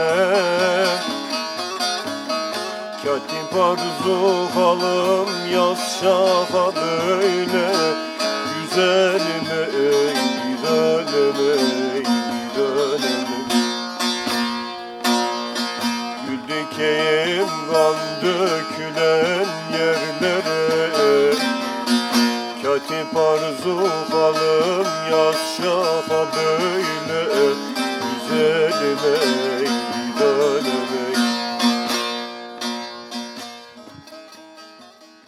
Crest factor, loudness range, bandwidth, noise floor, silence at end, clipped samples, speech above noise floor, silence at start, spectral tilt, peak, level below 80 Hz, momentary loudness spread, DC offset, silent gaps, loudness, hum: 16 dB; 4 LU; 16 kHz; -46 dBFS; 0.25 s; under 0.1%; 27 dB; 0 s; -3.5 dB/octave; -4 dBFS; -70 dBFS; 8 LU; under 0.1%; none; -20 LUFS; none